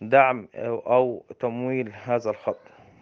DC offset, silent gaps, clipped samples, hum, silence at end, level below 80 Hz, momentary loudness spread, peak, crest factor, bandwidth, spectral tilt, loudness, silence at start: under 0.1%; none; under 0.1%; none; 0.45 s; -74 dBFS; 11 LU; -2 dBFS; 22 dB; 6.6 kHz; -7.5 dB/octave; -25 LUFS; 0 s